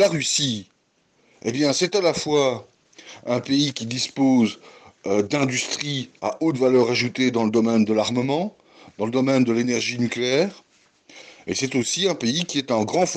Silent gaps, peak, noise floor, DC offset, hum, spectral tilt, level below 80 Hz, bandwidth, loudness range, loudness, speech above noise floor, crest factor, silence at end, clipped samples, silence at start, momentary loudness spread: none; -8 dBFS; -64 dBFS; under 0.1%; none; -4 dB/octave; -64 dBFS; 12 kHz; 3 LU; -22 LUFS; 43 dB; 14 dB; 0 s; under 0.1%; 0 s; 10 LU